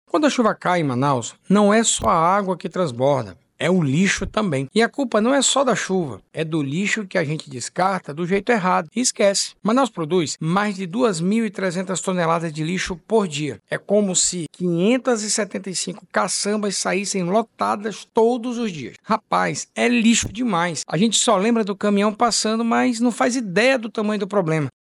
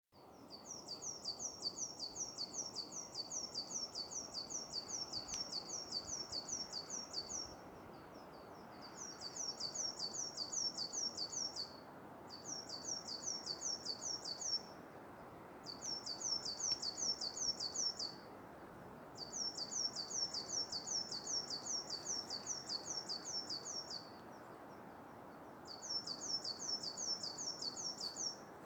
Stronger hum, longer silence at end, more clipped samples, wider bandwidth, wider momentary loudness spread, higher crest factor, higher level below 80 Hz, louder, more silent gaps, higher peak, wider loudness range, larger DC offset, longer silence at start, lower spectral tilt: neither; first, 0.15 s vs 0 s; neither; second, 12 kHz vs over 20 kHz; second, 8 LU vs 16 LU; second, 14 dB vs 20 dB; first, -52 dBFS vs -76 dBFS; first, -20 LUFS vs -42 LUFS; neither; first, -6 dBFS vs -26 dBFS; about the same, 3 LU vs 5 LU; neither; about the same, 0.15 s vs 0.15 s; first, -4 dB/octave vs -0.5 dB/octave